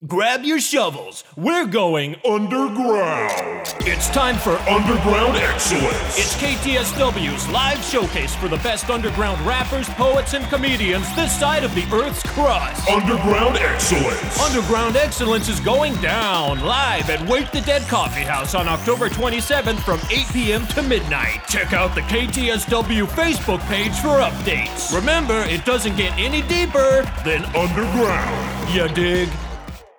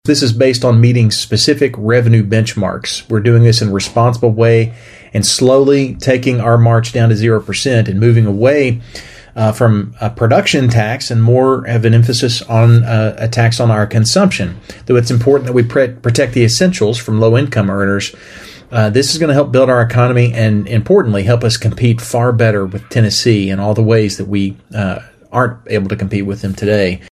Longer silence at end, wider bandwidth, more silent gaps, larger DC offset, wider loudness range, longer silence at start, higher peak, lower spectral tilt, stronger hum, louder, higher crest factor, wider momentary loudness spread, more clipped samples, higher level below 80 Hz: about the same, 0.15 s vs 0.15 s; first, over 20 kHz vs 13.5 kHz; neither; neither; about the same, 2 LU vs 2 LU; about the same, 0 s vs 0.05 s; second, -4 dBFS vs 0 dBFS; second, -4 dB/octave vs -6 dB/octave; neither; second, -19 LUFS vs -12 LUFS; about the same, 16 dB vs 12 dB; second, 4 LU vs 8 LU; neither; first, -30 dBFS vs -42 dBFS